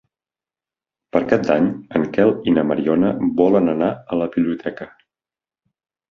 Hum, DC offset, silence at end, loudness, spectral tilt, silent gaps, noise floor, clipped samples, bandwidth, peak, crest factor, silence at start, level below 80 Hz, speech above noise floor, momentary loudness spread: none; under 0.1%; 1.25 s; -18 LUFS; -8.5 dB/octave; none; under -90 dBFS; under 0.1%; 6.8 kHz; -2 dBFS; 18 dB; 1.15 s; -54 dBFS; over 72 dB; 7 LU